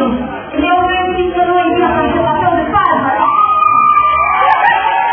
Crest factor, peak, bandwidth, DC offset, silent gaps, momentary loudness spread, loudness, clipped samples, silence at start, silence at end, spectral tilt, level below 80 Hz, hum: 12 dB; 0 dBFS; 5.4 kHz; under 0.1%; none; 5 LU; -11 LUFS; under 0.1%; 0 s; 0 s; -8.5 dB/octave; -36 dBFS; none